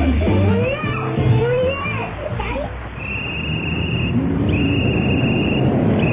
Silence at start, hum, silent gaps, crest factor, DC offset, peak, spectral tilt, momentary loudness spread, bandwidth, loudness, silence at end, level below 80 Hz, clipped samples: 0 s; none; none; 14 dB; under 0.1%; -4 dBFS; -11.5 dB/octave; 8 LU; 3.9 kHz; -19 LUFS; 0 s; -28 dBFS; under 0.1%